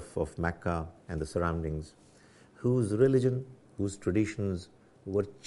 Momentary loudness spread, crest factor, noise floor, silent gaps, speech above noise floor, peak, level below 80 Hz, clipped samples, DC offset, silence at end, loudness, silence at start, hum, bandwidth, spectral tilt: 14 LU; 20 dB; -58 dBFS; none; 28 dB; -12 dBFS; -50 dBFS; under 0.1%; under 0.1%; 0.1 s; -31 LUFS; 0 s; none; 11.5 kHz; -7.5 dB/octave